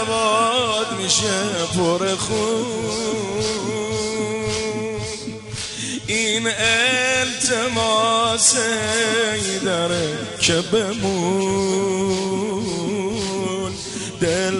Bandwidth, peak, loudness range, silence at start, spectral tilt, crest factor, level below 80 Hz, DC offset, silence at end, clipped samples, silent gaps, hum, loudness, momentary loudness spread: 11.5 kHz; -6 dBFS; 6 LU; 0 s; -3 dB/octave; 16 dB; -46 dBFS; under 0.1%; 0 s; under 0.1%; none; none; -20 LUFS; 9 LU